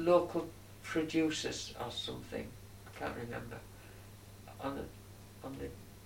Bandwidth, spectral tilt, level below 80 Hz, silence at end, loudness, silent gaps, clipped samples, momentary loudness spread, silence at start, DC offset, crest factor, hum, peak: 16.5 kHz; -4.5 dB/octave; -60 dBFS; 0 s; -38 LUFS; none; under 0.1%; 20 LU; 0 s; under 0.1%; 22 dB; none; -16 dBFS